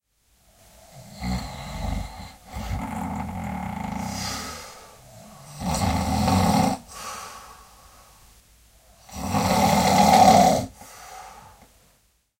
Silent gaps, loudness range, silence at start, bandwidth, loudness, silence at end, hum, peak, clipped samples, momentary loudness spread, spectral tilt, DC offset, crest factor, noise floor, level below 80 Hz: none; 12 LU; 0.95 s; 16 kHz; -22 LUFS; 0.9 s; none; -2 dBFS; under 0.1%; 25 LU; -4.5 dB/octave; under 0.1%; 22 dB; -64 dBFS; -40 dBFS